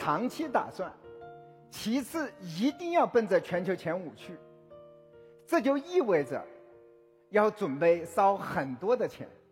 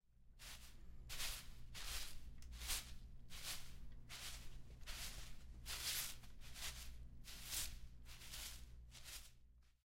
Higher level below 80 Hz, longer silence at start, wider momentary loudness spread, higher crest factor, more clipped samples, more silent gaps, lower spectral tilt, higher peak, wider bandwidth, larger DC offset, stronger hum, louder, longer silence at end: second, -72 dBFS vs -56 dBFS; about the same, 0 s vs 0.05 s; first, 21 LU vs 14 LU; about the same, 20 dB vs 22 dB; neither; neither; first, -6 dB/octave vs -1 dB/octave; first, -12 dBFS vs -30 dBFS; about the same, 16.5 kHz vs 16 kHz; neither; neither; first, -30 LUFS vs -50 LUFS; about the same, 0.2 s vs 0.15 s